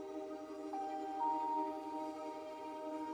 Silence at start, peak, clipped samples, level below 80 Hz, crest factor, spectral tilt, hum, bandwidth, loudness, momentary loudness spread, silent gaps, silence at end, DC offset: 0 s; -28 dBFS; under 0.1%; -82 dBFS; 14 dB; -4.5 dB/octave; none; over 20 kHz; -42 LUFS; 9 LU; none; 0 s; under 0.1%